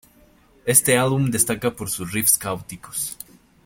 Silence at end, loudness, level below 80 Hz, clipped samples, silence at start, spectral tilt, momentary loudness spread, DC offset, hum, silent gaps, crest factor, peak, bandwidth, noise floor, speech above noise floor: 0.5 s; -20 LUFS; -52 dBFS; under 0.1%; 0.65 s; -3.5 dB/octave; 15 LU; under 0.1%; none; none; 22 dB; 0 dBFS; 17 kHz; -54 dBFS; 33 dB